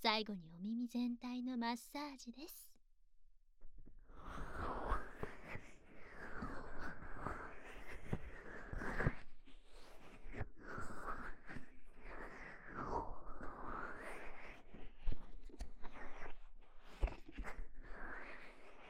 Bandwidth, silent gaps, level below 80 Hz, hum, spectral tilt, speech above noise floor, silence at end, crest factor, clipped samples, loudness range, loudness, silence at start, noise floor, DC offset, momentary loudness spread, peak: 15 kHz; none; -52 dBFS; none; -5.5 dB/octave; 20 dB; 0 s; 24 dB; under 0.1%; 6 LU; -48 LUFS; 0 s; -64 dBFS; under 0.1%; 19 LU; -20 dBFS